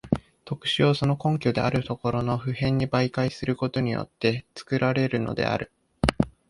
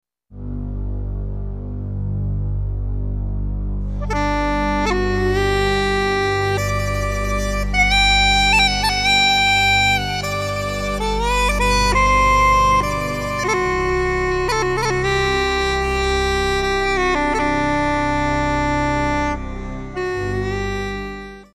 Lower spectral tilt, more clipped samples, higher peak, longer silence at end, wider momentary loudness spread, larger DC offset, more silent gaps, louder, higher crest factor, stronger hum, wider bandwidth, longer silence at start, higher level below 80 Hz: first, -7 dB/octave vs -4 dB/octave; neither; about the same, -2 dBFS vs -4 dBFS; about the same, 0.2 s vs 0.1 s; second, 7 LU vs 14 LU; neither; neither; second, -26 LUFS vs -18 LUFS; first, 24 dB vs 14 dB; neither; second, 11.5 kHz vs 15 kHz; second, 0.05 s vs 0.3 s; second, -44 dBFS vs -26 dBFS